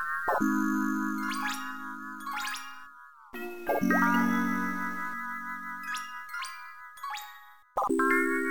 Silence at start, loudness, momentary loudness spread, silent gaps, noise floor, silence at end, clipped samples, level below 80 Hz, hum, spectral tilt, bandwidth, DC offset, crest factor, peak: 0 s; -30 LUFS; 16 LU; none; -52 dBFS; 0 s; under 0.1%; -66 dBFS; none; -4.5 dB/octave; 18 kHz; 0.5%; 18 dB; -12 dBFS